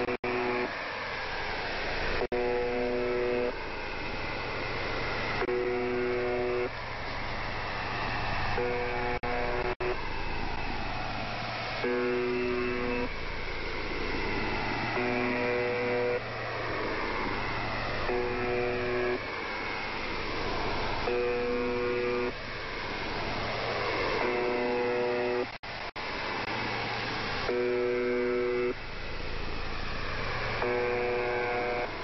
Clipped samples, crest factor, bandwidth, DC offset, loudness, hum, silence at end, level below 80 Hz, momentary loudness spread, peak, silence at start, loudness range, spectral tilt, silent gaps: under 0.1%; 16 dB; 6 kHz; under 0.1%; -31 LUFS; none; 0 s; -42 dBFS; 6 LU; -16 dBFS; 0 s; 1 LU; -3 dB/octave; 0.19-0.23 s, 9.76-9.80 s, 25.59-25.63 s